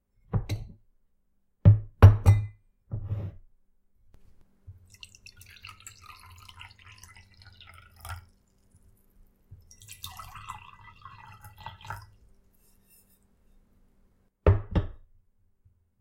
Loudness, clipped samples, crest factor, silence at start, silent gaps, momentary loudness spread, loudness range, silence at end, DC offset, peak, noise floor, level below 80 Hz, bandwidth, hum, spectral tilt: -24 LUFS; under 0.1%; 28 dB; 0.35 s; none; 28 LU; 25 LU; 1.1 s; under 0.1%; -2 dBFS; -69 dBFS; -40 dBFS; 13.5 kHz; none; -7.5 dB/octave